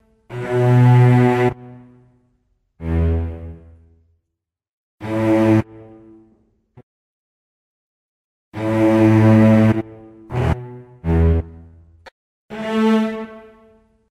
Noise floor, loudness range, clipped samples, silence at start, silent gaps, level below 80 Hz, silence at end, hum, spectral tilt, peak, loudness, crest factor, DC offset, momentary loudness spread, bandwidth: -80 dBFS; 10 LU; under 0.1%; 0.3 s; 4.69-4.98 s, 6.83-8.52 s, 12.12-12.49 s; -34 dBFS; 0.7 s; none; -9 dB/octave; -2 dBFS; -16 LUFS; 16 dB; under 0.1%; 23 LU; 9.8 kHz